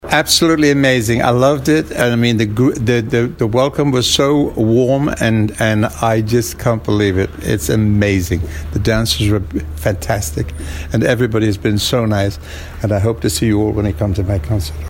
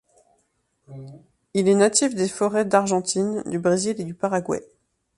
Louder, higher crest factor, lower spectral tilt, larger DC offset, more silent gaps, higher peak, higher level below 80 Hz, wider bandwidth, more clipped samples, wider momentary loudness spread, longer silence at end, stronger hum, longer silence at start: first, -15 LUFS vs -22 LUFS; second, 14 dB vs 20 dB; about the same, -5 dB/octave vs -4.5 dB/octave; neither; neither; first, 0 dBFS vs -4 dBFS; first, -30 dBFS vs -64 dBFS; first, 16.5 kHz vs 11.5 kHz; neither; second, 8 LU vs 12 LU; second, 0 s vs 0.55 s; neither; second, 0.05 s vs 0.9 s